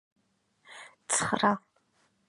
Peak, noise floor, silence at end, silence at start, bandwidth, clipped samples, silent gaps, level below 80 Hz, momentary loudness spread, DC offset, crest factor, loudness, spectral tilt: -10 dBFS; -72 dBFS; 0.7 s; 0.7 s; 11.5 kHz; under 0.1%; none; -68 dBFS; 22 LU; under 0.1%; 24 dB; -28 LUFS; -2.5 dB/octave